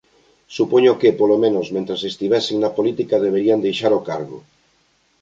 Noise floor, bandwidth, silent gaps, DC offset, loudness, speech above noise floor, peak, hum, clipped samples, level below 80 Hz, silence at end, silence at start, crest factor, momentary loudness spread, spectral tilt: -61 dBFS; 7.8 kHz; none; under 0.1%; -18 LUFS; 44 dB; -2 dBFS; none; under 0.1%; -64 dBFS; 0.85 s; 0.5 s; 16 dB; 10 LU; -6 dB/octave